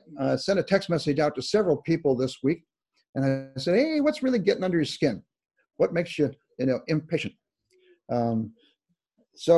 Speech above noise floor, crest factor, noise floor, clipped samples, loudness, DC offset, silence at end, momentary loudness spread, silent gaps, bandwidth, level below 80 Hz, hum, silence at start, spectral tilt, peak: 48 dB; 20 dB; -73 dBFS; under 0.1%; -26 LUFS; under 0.1%; 0 s; 7 LU; 3.09-3.13 s; 12 kHz; -62 dBFS; none; 0.1 s; -6.5 dB/octave; -8 dBFS